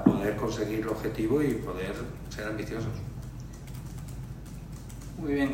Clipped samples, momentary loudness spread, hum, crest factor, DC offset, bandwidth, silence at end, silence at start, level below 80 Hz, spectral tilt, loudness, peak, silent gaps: under 0.1%; 15 LU; none; 26 dB; under 0.1%; 16 kHz; 0 s; 0 s; -44 dBFS; -7 dB/octave; -33 LUFS; -6 dBFS; none